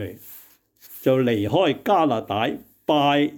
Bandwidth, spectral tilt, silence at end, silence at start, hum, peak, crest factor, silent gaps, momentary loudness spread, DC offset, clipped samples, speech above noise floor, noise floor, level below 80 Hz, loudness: 19.5 kHz; -6.5 dB/octave; 0 s; 0 s; none; -8 dBFS; 14 dB; none; 18 LU; under 0.1%; under 0.1%; 31 dB; -52 dBFS; -64 dBFS; -21 LUFS